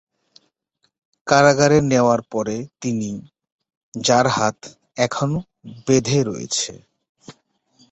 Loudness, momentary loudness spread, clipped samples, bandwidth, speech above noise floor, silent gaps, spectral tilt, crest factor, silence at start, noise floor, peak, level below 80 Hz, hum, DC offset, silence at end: -19 LUFS; 19 LU; under 0.1%; 8.4 kHz; 51 dB; 3.52-3.59 s, 3.77-3.92 s, 7.09-7.15 s; -4.5 dB/octave; 20 dB; 1.25 s; -70 dBFS; 0 dBFS; -54 dBFS; none; under 0.1%; 0.6 s